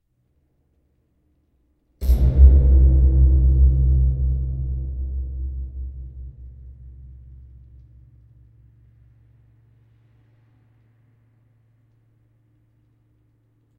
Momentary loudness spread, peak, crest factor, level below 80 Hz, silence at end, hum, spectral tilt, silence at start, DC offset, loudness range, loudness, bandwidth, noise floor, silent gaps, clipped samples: 29 LU; 0 dBFS; 20 dB; -22 dBFS; 6.7 s; none; -10.5 dB/octave; 2 s; under 0.1%; 19 LU; -19 LUFS; 0.9 kHz; -66 dBFS; none; under 0.1%